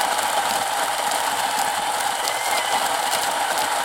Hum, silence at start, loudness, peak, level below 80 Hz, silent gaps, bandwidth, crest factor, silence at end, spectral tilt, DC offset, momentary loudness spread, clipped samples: none; 0 s; -21 LUFS; -2 dBFS; -60 dBFS; none; 17 kHz; 20 dB; 0 s; 0.5 dB/octave; under 0.1%; 2 LU; under 0.1%